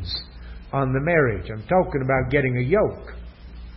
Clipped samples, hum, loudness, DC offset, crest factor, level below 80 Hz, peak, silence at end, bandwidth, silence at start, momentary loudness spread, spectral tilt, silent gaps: under 0.1%; none; -22 LUFS; under 0.1%; 18 dB; -38 dBFS; -6 dBFS; 0 s; 5.8 kHz; 0 s; 21 LU; -11.5 dB/octave; none